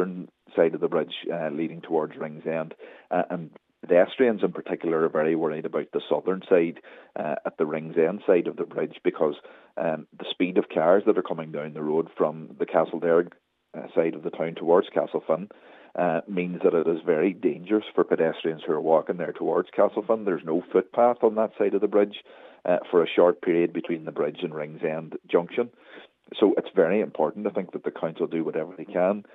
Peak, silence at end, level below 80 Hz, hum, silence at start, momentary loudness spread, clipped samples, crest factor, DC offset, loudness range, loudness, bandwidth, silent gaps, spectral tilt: -6 dBFS; 0.1 s; -84 dBFS; none; 0 s; 11 LU; under 0.1%; 20 dB; under 0.1%; 3 LU; -25 LUFS; 4 kHz; none; -9 dB/octave